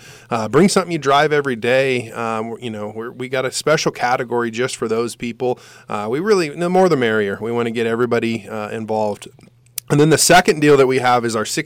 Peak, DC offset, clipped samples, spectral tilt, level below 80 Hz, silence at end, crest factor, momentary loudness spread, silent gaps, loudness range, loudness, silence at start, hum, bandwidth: -4 dBFS; under 0.1%; under 0.1%; -4.5 dB/octave; -50 dBFS; 0 s; 14 dB; 14 LU; none; 5 LU; -17 LUFS; 0.05 s; none; 16.5 kHz